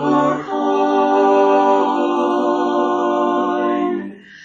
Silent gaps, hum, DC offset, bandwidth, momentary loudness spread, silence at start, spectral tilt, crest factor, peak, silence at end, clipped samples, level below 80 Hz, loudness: none; none; under 0.1%; 7.4 kHz; 7 LU; 0 s; -6 dB/octave; 14 dB; -4 dBFS; 0 s; under 0.1%; -66 dBFS; -16 LUFS